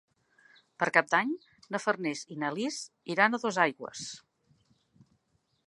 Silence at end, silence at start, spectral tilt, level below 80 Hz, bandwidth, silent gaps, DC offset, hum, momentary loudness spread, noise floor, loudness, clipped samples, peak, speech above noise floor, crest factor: 1.5 s; 0.8 s; -3.5 dB/octave; -80 dBFS; 11.5 kHz; none; under 0.1%; none; 14 LU; -75 dBFS; -30 LUFS; under 0.1%; -6 dBFS; 44 dB; 26 dB